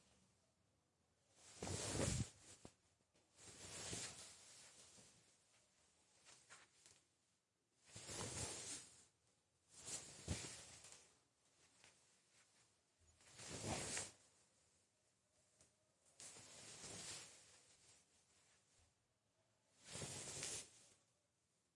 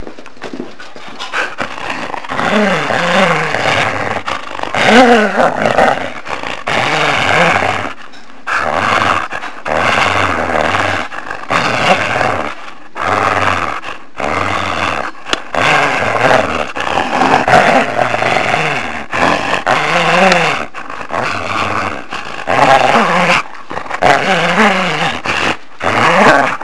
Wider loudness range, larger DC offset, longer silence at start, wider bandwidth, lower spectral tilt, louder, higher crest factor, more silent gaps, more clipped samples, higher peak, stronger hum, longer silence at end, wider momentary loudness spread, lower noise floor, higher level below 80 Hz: first, 9 LU vs 3 LU; second, under 0.1% vs 5%; about the same, 0 s vs 0 s; about the same, 11.5 kHz vs 11 kHz; about the same, -3 dB/octave vs -4 dB/octave; second, -50 LUFS vs -12 LUFS; first, 28 dB vs 14 dB; neither; second, under 0.1% vs 0.2%; second, -28 dBFS vs 0 dBFS; neither; first, 0.8 s vs 0 s; first, 22 LU vs 14 LU; first, -86 dBFS vs -36 dBFS; second, -72 dBFS vs -44 dBFS